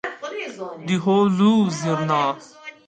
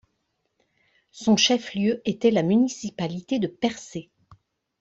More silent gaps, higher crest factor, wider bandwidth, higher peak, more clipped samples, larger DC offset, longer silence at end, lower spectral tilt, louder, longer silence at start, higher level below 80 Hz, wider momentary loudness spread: neither; about the same, 14 dB vs 18 dB; first, 9 kHz vs 8 kHz; about the same, -6 dBFS vs -6 dBFS; neither; neither; second, 0.15 s vs 0.8 s; first, -6 dB/octave vs -4.5 dB/octave; first, -20 LUFS vs -23 LUFS; second, 0.05 s vs 1.15 s; about the same, -66 dBFS vs -64 dBFS; first, 15 LU vs 12 LU